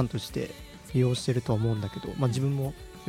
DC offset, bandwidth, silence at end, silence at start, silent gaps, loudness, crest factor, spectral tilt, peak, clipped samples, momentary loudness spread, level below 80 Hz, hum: under 0.1%; 15.5 kHz; 0 s; 0 s; none; -29 LUFS; 16 dB; -6.5 dB/octave; -14 dBFS; under 0.1%; 9 LU; -50 dBFS; none